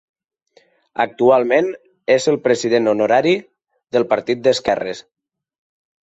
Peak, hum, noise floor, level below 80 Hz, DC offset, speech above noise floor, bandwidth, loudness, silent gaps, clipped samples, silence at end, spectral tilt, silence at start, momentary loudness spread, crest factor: -2 dBFS; none; -56 dBFS; -60 dBFS; under 0.1%; 40 dB; 8 kHz; -17 LUFS; none; under 0.1%; 1 s; -4.5 dB/octave; 1 s; 10 LU; 16 dB